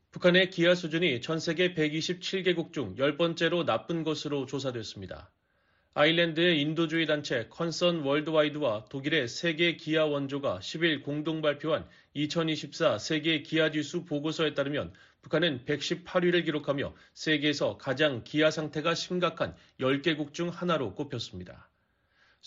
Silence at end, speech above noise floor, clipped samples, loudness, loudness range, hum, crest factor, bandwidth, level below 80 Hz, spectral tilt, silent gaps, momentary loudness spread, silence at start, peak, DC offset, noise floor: 0.9 s; 43 dB; under 0.1%; -29 LUFS; 3 LU; none; 18 dB; 7.6 kHz; -66 dBFS; -3.5 dB/octave; none; 10 LU; 0.15 s; -10 dBFS; under 0.1%; -72 dBFS